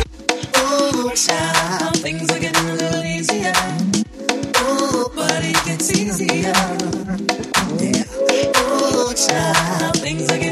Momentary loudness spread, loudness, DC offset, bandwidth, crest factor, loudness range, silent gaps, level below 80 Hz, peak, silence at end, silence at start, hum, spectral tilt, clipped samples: 5 LU; -18 LUFS; under 0.1%; 15.5 kHz; 18 dB; 1 LU; none; -44 dBFS; 0 dBFS; 0 s; 0 s; none; -3 dB/octave; under 0.1%